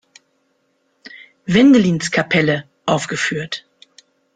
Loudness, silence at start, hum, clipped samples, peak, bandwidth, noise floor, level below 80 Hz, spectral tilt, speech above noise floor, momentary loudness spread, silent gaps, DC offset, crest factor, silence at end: -16 LUFS; 1.05 s; none; under 0.1%; -2 dBFS; 9.4 kHz; -65 dBFS; -54 dBFS; -5 dB/octave; 50 dB; 15 LU; none; under 0.1%; 16 dB; 0.75 s